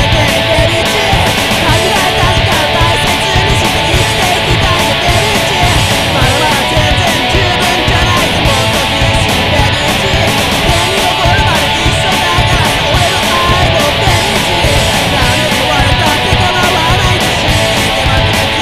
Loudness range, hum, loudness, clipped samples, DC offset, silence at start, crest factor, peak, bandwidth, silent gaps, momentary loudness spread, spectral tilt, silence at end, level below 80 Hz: 0 LU; none; -9 LUFS; 0.1%; 0.5%; 0 s; 10 dB; 0 dBFS; 16 kHz; none; 1 LU; -3.5 dB/octave; 0 s; -20 dBFS